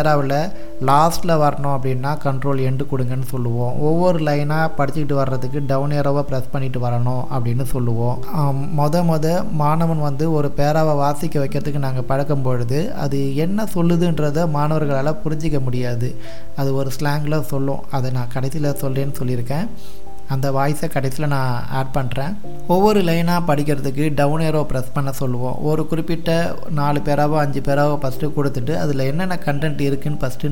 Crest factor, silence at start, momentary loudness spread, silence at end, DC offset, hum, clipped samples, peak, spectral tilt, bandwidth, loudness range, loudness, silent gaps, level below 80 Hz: 18 dB; 0 s; 6 LU; 0 s; 10%; none; under 0.1%; 0 dBFS; -7 dB/octave; 17 kHz; 4 LU; -20 LUFS; none; -38 dBFS